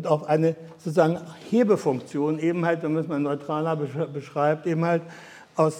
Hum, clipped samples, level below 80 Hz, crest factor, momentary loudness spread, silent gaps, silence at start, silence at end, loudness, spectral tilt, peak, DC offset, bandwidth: none; under 0.1%; -74 dBFS; 18 dB; 9 LU; none; 0 s; 0 s; -25 LUFS; -7.5 dB/octave; -6 dBFS; under 0.1%; 12 kHz